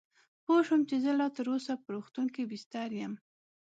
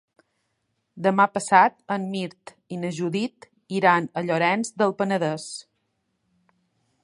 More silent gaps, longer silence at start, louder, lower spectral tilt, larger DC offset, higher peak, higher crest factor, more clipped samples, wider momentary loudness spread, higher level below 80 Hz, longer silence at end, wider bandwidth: first, 2.66-2.71 s vs none; second, 0.5 s vs 0.95 s; second, -32 LUFS vs -23 LUFS; about the same, -6 dB/octave vs -5 dB/octave; neither; second, -16 dBFS vs -2 dBFS; second, 16 dB vs 24 dB; neither; about the same, 13 LU vs 14 LU; second, -86 dBFS vs -74 dBFS; second, 0.45 s vs 1.45 s; second, 8 kHz vs 11.5 kHz